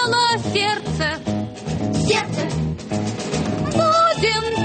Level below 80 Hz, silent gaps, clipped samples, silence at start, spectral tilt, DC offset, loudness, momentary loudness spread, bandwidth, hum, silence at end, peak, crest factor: -44 dBFS; none; under 0.1%; 0 s; -4.5 dB/octave; under 0.1%; -20 LUFS; 9 LU; 9.2 kHz; none; 0 s; -6 dBFS; 14 dB